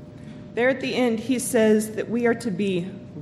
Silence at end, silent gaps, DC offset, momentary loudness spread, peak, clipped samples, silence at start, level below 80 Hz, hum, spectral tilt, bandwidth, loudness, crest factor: 0 s; none; under 0.1%; 14 LU; -8 dBFS; under 0.1%; 0 s; -58 dBFS; none; -5 dB/octave; 15.5 kHz; -23 LUFS; 16 dB